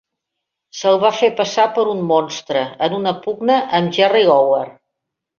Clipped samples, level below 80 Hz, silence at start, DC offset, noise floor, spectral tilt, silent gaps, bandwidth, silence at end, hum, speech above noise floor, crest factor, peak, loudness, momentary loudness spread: under 0.1%; -64 dBFS; 0.75 s; under 0.1%; -79 dBFS; -4.5 dB/octave; none; 7.2 kHz; 0.65 s; none; 64 dB; 16 dB; -2 dBFS; -16 LUFS; 8 LU